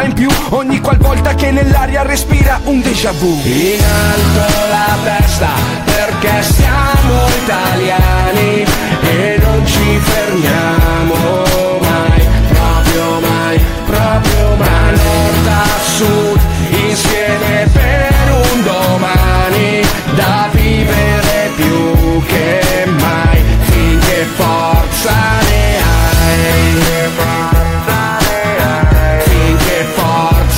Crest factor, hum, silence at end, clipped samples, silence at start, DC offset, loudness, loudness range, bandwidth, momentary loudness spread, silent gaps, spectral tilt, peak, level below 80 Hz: 10 dB; none; 0 s; under 0.1%; 0 s; under 0.1%; -11 LUFS; 1 LU; 16.5 kHz; 2 LU; none; -5 dB/octave; 0 dBFS; -16 dBFS